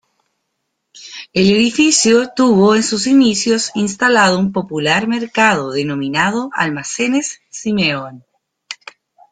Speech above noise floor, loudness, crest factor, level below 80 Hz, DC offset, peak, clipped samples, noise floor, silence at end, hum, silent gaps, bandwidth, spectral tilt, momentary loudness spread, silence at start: 58 dB; -14 LUFS; 14 dB; -54 dBFS; under 0.1%; -2 dBFS; under 0.1%; -72 dBFS; 0.55 s; none; none; 9.6 kHz; -3.5 dB/octave; 14 LU; 0.95 s